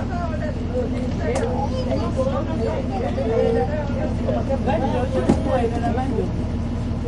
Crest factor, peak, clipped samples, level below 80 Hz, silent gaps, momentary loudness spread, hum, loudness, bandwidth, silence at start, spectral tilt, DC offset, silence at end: 18 dB; -4 dBFS; under 0.1%; -30 dBFS; none; 5 LU; none; -23 LUFS; 11 kHz; 0 s; -8 dB/octave; under 0.1%; 0 s